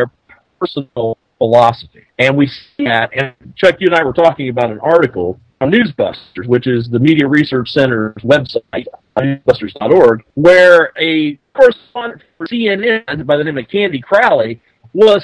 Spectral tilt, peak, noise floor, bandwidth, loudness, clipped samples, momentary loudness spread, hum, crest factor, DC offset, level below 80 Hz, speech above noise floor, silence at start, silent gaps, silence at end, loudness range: -7 dB/octave; 0 dBFS; -49 dBFS; 11 kHz; -13 LUFS; 1%; 13 LU; none; 12 dB; under 0.1%; -48 dBFS; 37 dB; 0 s; none; 0 s; 4 LU